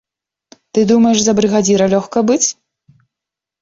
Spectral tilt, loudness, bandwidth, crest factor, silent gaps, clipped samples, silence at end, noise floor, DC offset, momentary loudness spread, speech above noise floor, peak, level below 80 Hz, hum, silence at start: -4.5 dB/octave; -13 LUFS; 7.8 kHz; 14 dB; none; under 0.1%; 1.1 s; -84 dBFS; under 0.1%; 6 LU; 72 dB; -2 dBFS; -52 dBFS; none; 0.75 s